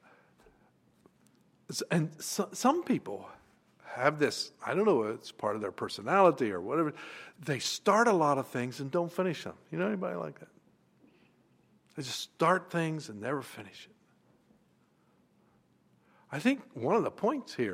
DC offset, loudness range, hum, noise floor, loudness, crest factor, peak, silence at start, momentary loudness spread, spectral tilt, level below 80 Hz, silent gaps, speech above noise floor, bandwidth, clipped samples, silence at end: under 0.1%; 10 LU; none; -69 dBFS; -31 LUFS; 22 dB; -10 dBFS; 1.7 s; 17 LU; -5 dB/octave; -80 dBFS; none; 38 dB; 16 kHz; under 0.1%; 0 s